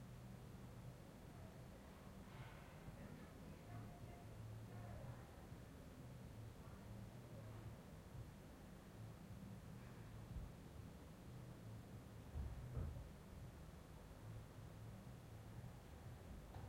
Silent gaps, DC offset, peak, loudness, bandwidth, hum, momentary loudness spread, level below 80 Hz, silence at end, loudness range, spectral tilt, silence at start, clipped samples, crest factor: none; under 0.1%; -38 dBFS; -58 LUFS; 16 kHz; none; 5 LU; -62 dBFS; 0 s; 3 LU; -6.5 dB/octave; 0 s; under 0.1%; 18 dB